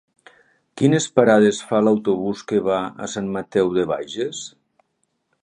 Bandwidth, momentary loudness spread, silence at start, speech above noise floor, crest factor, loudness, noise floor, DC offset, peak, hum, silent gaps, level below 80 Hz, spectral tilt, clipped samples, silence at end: 10.5 kHz; 12 LU; 0.75 s; 52 dB; 20 dB; -20 LUFS; -71 dBFS; under 0.1%; 0 dBFS; none; none; -60 dBFS; -5.5 dB/octave; under 0.1%; 0.95 s